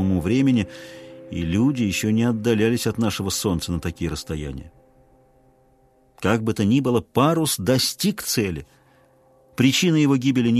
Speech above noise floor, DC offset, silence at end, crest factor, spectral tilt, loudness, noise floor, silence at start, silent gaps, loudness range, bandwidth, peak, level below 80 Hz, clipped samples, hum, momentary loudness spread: 37 dB; under 0.1%; 0 s; 18 dB; -5 dB/octave; -21 LUFS; -58 dBFS; 0 s; none; 6 LU; 14 kHz; -2 dBFS; -46 dBFS; under 0.1%; none; 13 LU